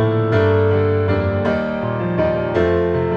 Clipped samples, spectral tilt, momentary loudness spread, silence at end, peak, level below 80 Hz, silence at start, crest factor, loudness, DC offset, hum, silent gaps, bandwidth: under 0.1%; -9.5 dB/octave; 5 LU; 0 s; -4 dBFS; -40 dBFS; 0 s; 12 dB; -18 LUFS; under 0.1%; none; none; 6 kHz